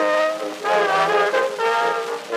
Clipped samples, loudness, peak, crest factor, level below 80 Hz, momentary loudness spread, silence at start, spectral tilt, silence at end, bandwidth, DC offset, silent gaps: under 0.1%; -20 LUFS; -6 dBFS; 14 dB; -86 dBFS; 6 LU; 0 s; -2.5 dB/octave; 0 s; 15.5 kHz; under 0.1%; none